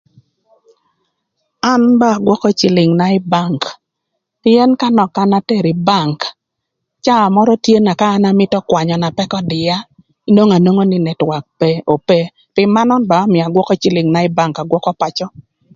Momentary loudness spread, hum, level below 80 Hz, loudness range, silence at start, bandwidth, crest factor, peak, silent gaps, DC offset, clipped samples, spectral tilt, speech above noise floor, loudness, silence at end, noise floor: 8 LU; none; -54 dBFS; 1 LU; 1.65 s; 7.6 kHz; 14 dB; 0 dBFS; none; under 0.1%; under 0.1%; -6.5 dB/octave; 63 dB; -13 LUFS; 0.5 s; -75 dBFS